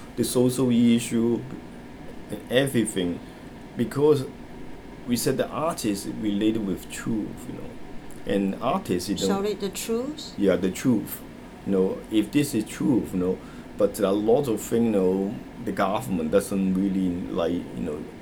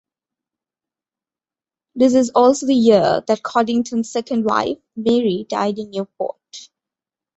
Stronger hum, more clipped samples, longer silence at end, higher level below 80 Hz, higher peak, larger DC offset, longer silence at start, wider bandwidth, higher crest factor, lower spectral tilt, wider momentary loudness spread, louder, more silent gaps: neither; neither; second, 0 s vs 0.7 s; first, -50 dBFS vs -60 dBFS; second, -6 dBFS vs -2 dBFS; neither; second, 0 s vs 1.95 s; first, over 20 kHz vs 8.2 kHz; about the same, 20 dB vs 18 dB; about the same, -5.5 dB/octave vs -5 dB/octave; first, 17 LU vs 14 LU; second, -25 LUFS vs -18 LUFS; neither